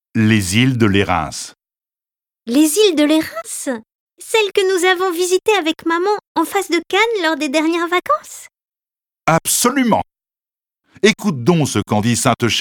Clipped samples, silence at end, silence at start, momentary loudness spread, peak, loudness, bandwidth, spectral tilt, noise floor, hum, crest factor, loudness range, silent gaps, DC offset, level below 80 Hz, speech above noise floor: under 0.1%; 0 s; 0.15 s; 10 LU; 0 dBFS; -16 LUFS; 19 kHz; -4 dB/octave; under -90 dBFS; none; 16 dB; 2 LU; 3.95-4.07 s, 6.27-6.35 s; under 0.1%; -50 dBFS; over 74 dB